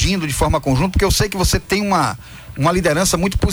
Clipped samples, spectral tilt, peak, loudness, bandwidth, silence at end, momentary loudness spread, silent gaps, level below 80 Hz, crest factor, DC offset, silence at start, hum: under 0.1%; -4.5 dB/octave; -4 dBFS; -17 LUFS; over 20 kHz; 0 s; 4 LU; none; -26 dBFS; 12 dB; under 0.1%; 0 s; none